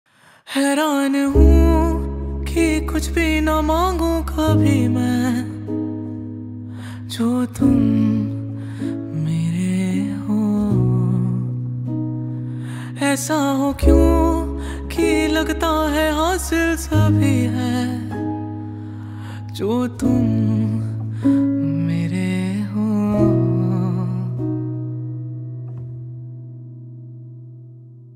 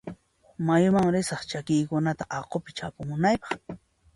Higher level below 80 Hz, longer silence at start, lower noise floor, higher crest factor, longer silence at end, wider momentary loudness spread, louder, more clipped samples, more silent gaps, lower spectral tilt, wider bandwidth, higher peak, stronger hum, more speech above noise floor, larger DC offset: first, -28 dBFS vs -56 dBFS; first, 0.45 s vs 0.05 s; second, -40 dBFS vs -48 dBFS; about the same, 18 dB vs 18 dB; second, 0 s vs 0.4 s; about the same, 16 LU vs 15 LU; first, -19 LUFS vs -27 LUFS; neither; neither; about the same, -6.5 dB/octave vs -6 dB/octave; first, 16 kHz vs 11.5 kHz; first, 0 dBFS vs -10 dBFS; neither; about the same, 24 dB vs 22 dB; neither